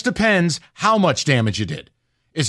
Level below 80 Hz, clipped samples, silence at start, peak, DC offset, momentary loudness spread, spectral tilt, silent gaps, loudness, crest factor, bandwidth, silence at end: -48 dBFS; under 0.1%; 0.05 s; -4 dBFS; under 0.1%; 12 LU; -4.5 dB/octave; none; -18 LUFS; 16 dB; 12 kHz; 0 s